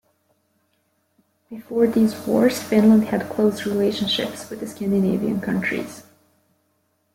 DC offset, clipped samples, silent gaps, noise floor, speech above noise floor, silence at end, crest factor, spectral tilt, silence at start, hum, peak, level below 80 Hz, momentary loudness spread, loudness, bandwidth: under 0.1%; under 0.1%; none; -68 dBFS; 48 dB; 1.15 s; 18 dB; -6 dB/octave; 1.5 s; none; -4 dBFS; -60 dBFS; 14 LU; -20 LUFS; 16.5 kHz